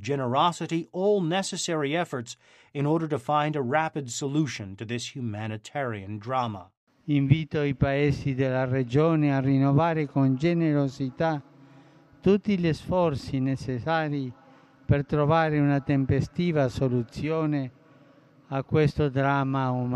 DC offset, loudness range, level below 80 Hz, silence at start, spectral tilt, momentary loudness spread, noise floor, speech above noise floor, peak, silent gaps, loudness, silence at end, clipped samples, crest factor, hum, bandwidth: under 0.1%; 5 LU; -50 dBFS; 0 s; -6.5 dB/octave; 10 LU; -56 dBFS; 31 dB; -6 dBFS; 6.77-6.87 s; -26 LUFS; 0 s; under 0.1%; 20 dB; none; 9.8 kHz